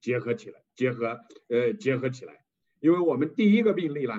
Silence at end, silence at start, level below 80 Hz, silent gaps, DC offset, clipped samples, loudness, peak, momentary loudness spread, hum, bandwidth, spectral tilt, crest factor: 0 s; 0.05 s; -78 dBFS; none; under 0.1%; under 0.1%; -26 LUFS; -10 dBFS; 11 LU; none; 7.6 kHz; -7.5 dB/octave; 16 dB